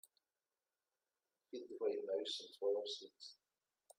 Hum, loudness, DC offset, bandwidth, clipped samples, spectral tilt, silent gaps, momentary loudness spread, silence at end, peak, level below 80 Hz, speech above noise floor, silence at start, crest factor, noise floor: none; -43 LUFS; under 0.1%; 14 kHz; under 0.1%; -2 dB/octave; none; 15 LU; 0.65 s; -28 dBFS; under -90 dBFS; over 46 dB; 1.55 s; 18 dB; under -90 dBFS